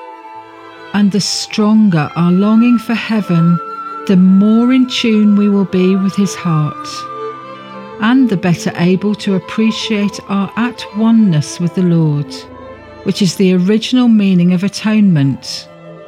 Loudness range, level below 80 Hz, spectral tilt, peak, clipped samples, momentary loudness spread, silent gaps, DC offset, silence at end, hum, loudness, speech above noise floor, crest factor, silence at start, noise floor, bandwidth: 4 LU; -56 dBFS; -6.5 dB/octave; 0 dBFS; under 0.1%; 15 LU; none; under 0.1%; 0 s; none; -12 LUFS; 22 dB; 12 dB; 0 s; -34 dBFS; 13.5 kHz